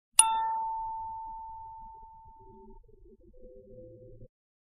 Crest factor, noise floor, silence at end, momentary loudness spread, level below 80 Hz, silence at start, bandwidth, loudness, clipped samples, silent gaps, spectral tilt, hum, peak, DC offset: 34 dB; -56 dBFS; 0.55 s; 29 LU; -58 dBFS; 0.2 s; 6.4 kHz; -29 LUFS; under 0.1%; none; 0.5 dB/octave; none; -2 dBFS; under 0.1%